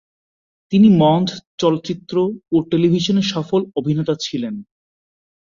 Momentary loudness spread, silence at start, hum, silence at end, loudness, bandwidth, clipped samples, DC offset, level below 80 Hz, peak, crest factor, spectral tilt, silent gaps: 11 LU; 0.7 s; none; 0.8 s; -17 LUFS; 7.4 kHz; under 0.1%; under 0.1%; -56 dBFS; -2 dBFS; 16 dB; -7 dB/octave; 1.47-1.58 s